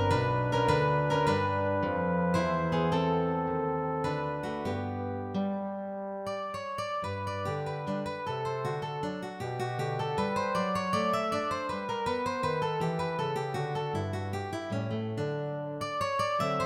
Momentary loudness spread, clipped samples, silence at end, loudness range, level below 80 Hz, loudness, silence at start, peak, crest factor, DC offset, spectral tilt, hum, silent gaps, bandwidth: 8 LU; under 0.1%; 0 s; 6 LU; -56 dBFS; -31 LUFS; 0 s; -12 dBFS; 20 dB; under 0.1%; -6.5 dB/octave; none; none; 15 kHz